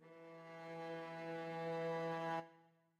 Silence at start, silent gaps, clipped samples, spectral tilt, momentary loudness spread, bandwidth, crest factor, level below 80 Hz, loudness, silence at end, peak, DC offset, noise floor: 0 s; none; under 0.1%; -6.5 dB/octave; 14 LU; 13 kHz; 16 dB; under -90 dBFS; -46 LUFS; 0.3 s; -32 dBFS; under 0.1%; -70 dBFS